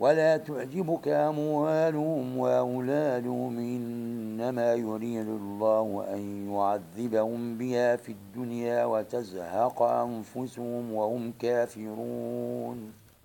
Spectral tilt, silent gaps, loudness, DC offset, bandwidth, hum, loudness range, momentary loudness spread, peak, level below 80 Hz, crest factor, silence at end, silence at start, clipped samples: -7 dB/octave; none; -30 LUFS; under 0.1%; 17 kHz; none; 3 LU; 9 LU; -10 dBFS; -74 dBFS; 18 dB; 0.3 s; 0 s; under 0.1%